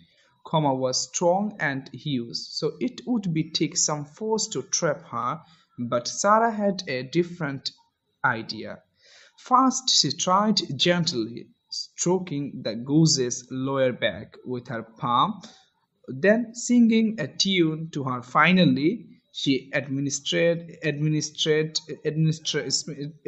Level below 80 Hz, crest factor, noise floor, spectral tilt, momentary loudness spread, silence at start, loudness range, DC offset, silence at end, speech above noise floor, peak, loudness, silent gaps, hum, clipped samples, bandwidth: -68 dBFS; 22 dB; -55 dBFS; -4 dB/octave; 13 LU; 0.45 s; 4 LU; under 0.1%; 0.15 s; 31 dB; -4 dBFS; -24 LUFS; none; none; under 0.1%; 8.6 kHz